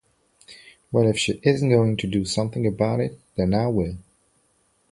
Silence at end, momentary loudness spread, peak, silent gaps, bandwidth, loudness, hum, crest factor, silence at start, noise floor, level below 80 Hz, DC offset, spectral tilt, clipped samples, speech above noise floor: 0.9 s; 7 LU; -4 dBFS; none; 11.5 kHz; -23 LUFS; none; 18 dB; 0.5 s; -65 dBFS; -46 dBFS; under 0.1%; -6 dB/octave; under 0.1%; 44 dB